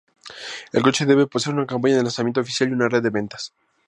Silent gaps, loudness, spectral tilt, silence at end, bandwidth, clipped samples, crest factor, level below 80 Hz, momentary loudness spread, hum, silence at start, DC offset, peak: none; -20 LUFS; -5 dB/octave; 0.4 s; 11 kHz; under 0.1%; 20 dB; -64 dBFS; 16 LU; none; 0.25 s; under 0.1%; -2 dBFS